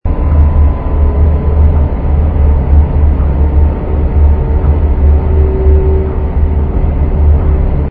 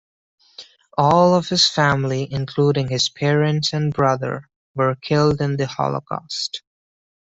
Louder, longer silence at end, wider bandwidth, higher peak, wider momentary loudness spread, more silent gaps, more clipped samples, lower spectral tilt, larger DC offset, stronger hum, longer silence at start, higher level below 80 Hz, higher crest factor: first, -11 LUFS vs -19 LUFS; second, 0 s vs 0.65 s; second, 2.9 kHz vs 8 kHz; about the same, 0 dBFS vs -2 dBFS; second, 4 LU vs 12 LU; second, none vs 4.56-4.75 s; first, 0.3% vs under 0.1%; first, -13 dB/octave vs -5 dB/octave; first, 0.7% vs under 0.1%; neither; second, 0.05 s vs 0.6 s; first, -10 dBFS vs -52 dBFS; second, 8 dB vs 18 dB